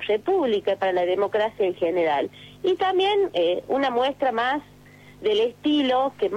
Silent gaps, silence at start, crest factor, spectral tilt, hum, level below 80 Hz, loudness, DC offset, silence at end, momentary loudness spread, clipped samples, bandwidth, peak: none; 0 s; 10 dB; -5.5 dB/octave; 50 Hz at -55 dBFS; -62 dBFS; -23 LUFS; under 0.1%; 0 s; 5 LU; under 0.1%; 11 kHz; -12 dBFS